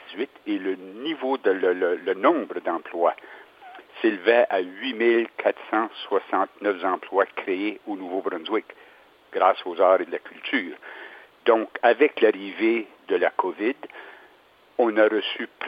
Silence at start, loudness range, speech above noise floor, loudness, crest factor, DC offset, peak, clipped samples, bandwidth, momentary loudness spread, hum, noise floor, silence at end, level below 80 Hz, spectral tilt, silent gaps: 0.05 s; 3 LU; 32 dB; -24 LUFS; 22 dB; under 0.1%; -2 dBFS; under 0.1%; 5.2 kHz; 13 LU; none; -56 dBFS; 0 s; -82 dBFS; -6.5 dB/octave; none